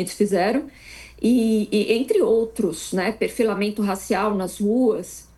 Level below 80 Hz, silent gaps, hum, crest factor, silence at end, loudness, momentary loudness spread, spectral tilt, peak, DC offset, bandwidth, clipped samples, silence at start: -52 dBFS; none; none; 14 dB; 0.15 s; -22 LUFS; 7 LU; -5.5 dB/octave; -8 dBFS; under 0.1%; 12.5 kHz; under 0.1%; 0 s